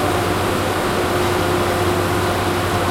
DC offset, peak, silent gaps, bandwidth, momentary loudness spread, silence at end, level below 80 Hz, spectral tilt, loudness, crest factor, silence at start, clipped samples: under 0.1%; -6 dBFS; none; 16 kHz; 1 LU; 0 s; -36 dBFS; -5 dB/octave; -18 LUFS; 12 dB; 0 s; under 0.1%